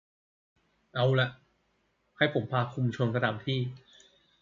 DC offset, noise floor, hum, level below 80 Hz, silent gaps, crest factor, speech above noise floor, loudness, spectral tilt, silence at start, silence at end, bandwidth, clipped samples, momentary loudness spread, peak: under 0.1%; -73 dBFS; none; -68 dBFS; none; 24 dB; 45 dB; -30 LUFS; -7.5 dB/octave; 0.95 s; 0.65 s; 7.4 kHz; under 0.1%; 6 LU; -8 dBFS